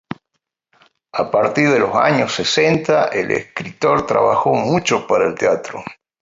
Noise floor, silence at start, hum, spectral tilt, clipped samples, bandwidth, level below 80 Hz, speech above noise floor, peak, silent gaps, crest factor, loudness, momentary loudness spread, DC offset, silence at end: -75 dBFS; 0.1 s; none; -4.5 dB/octave; under 0.1%; 7.8 kHz; -54 dBFS; 58 dB; -2 dBFS; none; 16 dB; -16 LUFS; 14 LU; under 0.1%; 0.3 s